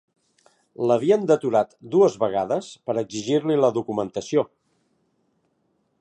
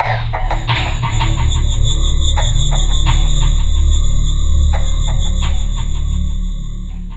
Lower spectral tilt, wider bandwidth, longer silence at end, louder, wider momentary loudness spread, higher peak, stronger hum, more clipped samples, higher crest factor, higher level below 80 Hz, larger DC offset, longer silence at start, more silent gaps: first, -6 dB/octave vs -4 dB/octave; first, 9.4 kHz vs 8.2 kHz; first, 1.55 s vs 0 s; second, -22 LUFS vs -17 LUFS; about the same, 8 LU vs 6 LU; second, -6 dBFS vs 0 dBFS; neither; neither; first, 18 dB vs 12 dB; second, -68 dBFS vs -14 dBFS; second, under 0.1% vs 8%; first, 0.8 s vs 0 s; neither